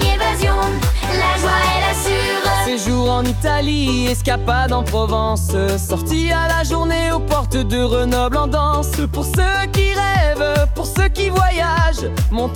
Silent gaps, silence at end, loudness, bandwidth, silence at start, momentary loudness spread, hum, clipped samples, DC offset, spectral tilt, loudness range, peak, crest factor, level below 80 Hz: none; 0 s; -17 LUFS; 18 kHz; 0 s; 3 LU; none; under 0.1%; under 0.1%; -5 dB/octave; 1 LU; -2 dBFS; 14 dB; -22 dBFS